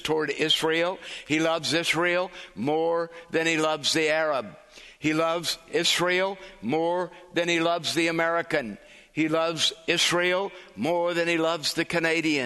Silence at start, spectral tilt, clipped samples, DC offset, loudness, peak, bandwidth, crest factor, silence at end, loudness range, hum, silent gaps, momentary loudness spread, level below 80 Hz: 0 s; -3 dB/octave; under 0.1%; under 0.1%; -25 LUFS; -8 dBFS; 12.5 kHz; 18 dB; 0 s; 2 LU; none; none; 8 LU; -64 dBFS